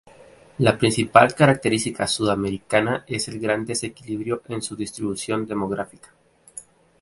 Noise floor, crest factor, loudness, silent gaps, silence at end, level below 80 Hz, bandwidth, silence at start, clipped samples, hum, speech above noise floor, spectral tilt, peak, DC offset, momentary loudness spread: -49 dBFS; 22 dB; -22 LUFS; none; 0.4 s; -54 dBFS; 12 kHz; 0.2 s; under 0.1%; none; 27 dB; -4.5 dB/octave; 0 dBFS; under 0.1%; 14 LU